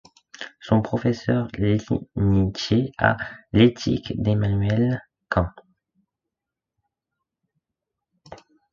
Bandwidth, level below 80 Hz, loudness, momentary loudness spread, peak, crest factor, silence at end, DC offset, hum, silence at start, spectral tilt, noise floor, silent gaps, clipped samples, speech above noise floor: 7.2 kHz; -42 dBFS; -23 LUFS; 11 LU; -2 dBFS; 22 dB; 0.35 s; under 0.1%; none; 0.4 s; -7 dB/octave; -86 dBFS; none; under 0.1%; 65 dB